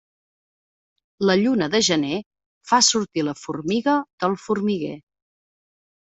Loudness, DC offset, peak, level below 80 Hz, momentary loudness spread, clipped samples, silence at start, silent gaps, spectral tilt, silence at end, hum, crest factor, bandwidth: -21 LUFS; under 0.1%; -4 dBFS; -64 dBFS; 11 LU; under 0.1%; 1.2 s; 2.26-2.31 s, 2.46-2.61 s, 4.13-4.18 s; -3.5 dB/octave; 1.2 s; none; 20 dB; 8.2 kHz